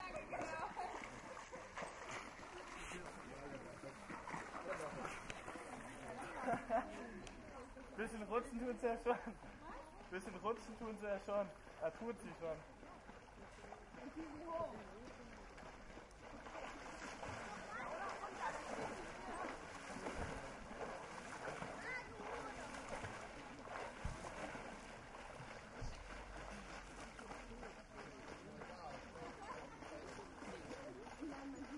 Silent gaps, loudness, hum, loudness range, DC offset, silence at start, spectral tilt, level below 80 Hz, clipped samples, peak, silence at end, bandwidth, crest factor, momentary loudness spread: none; -49 LUFS; none; 8 LU; under 0.1%; 0 s; -4.5 dB/octave; -62 dBFS; under 0.1%; -26 dBFS; 0 s; 11.5 kHz; 24 dB; 12 LU